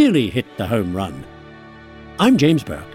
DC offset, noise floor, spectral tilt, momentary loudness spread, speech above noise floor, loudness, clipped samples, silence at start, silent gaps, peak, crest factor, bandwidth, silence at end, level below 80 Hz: under 0.1%; -40 dBFS; -6.5 dB/octave; 22 LU; 22 dB; -18 LUFS; under 0.1%; 0 s; none; -2 dBFS; 16 dB; 16 kHz; 0 s; -46 dBFS